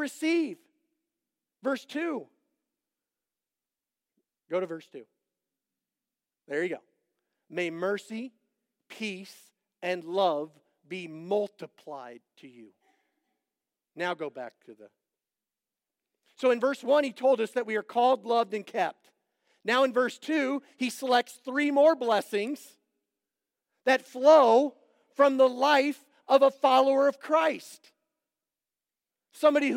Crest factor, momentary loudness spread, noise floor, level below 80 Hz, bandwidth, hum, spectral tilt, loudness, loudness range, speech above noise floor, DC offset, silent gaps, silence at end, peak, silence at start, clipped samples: 20 dB; 18 LU; under -90 dBFS; under -90 dBFS; 16.5 kHz; none; -4 dB/octave; -27 LUFS; 17 LU; over 63 dB; under 0.1%; none; 0 s; -8 dBFS; 0 s; under 0.1%